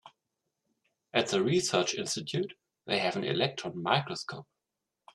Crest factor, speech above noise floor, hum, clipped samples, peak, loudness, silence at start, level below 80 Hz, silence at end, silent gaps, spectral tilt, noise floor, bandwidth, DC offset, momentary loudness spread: 24 dB; 56 dB; none; under 0.1%; -10 dBFS; -30 LUFS; 0.05 s; -72 dBFS; 0.7 s; none; -4 dB/octave; -87 dBFS; 12.5 kHz; under 0.1%; 12 LU